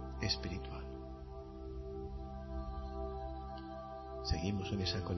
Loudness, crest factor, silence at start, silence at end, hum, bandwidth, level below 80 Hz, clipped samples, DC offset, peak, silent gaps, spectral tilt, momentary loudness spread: -42 LUFS; 20 dB; 0 s; 0 s; none; 6.2 kHz; -46 dBFS; under 0.1%; under 0.1%; -22 dBFS; none; -4.5 dB/octave; 11 LU